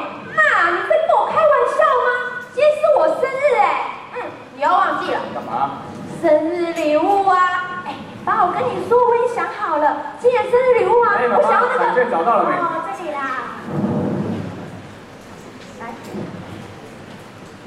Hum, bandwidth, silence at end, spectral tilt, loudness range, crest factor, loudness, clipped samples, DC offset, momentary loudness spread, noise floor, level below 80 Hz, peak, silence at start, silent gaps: none; 12 kHz; 0 s; -6 dB/octave; 10 LU; 14 dB; -17 LUFS; under 0.1%; under 0.1%; 20 LU; -38 dBFS; -58 dBFS; -4 dBFS; 0 s; none